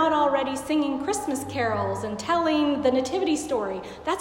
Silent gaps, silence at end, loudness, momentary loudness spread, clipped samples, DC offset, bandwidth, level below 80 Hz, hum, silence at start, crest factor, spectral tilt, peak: none; 0 s; -25 LUFS; 7 LU; under 0.1%; under 0.1%; 16 kHz; -56 dBFS; none; 0 s; 16 dB; -4.5 dB/octave; -10 dBFS